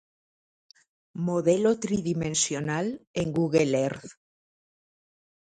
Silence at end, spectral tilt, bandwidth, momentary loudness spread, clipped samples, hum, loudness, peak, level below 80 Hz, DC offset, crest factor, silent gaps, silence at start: 1.45 s; -5 dB/octave; 9.6 kHz; 8 LU; under 0.1%; none; -26 LUFS; -8 dBFS; -60 dBFS; under 0.1%; 20 dB; 3.07-3.14 s; 1.15 s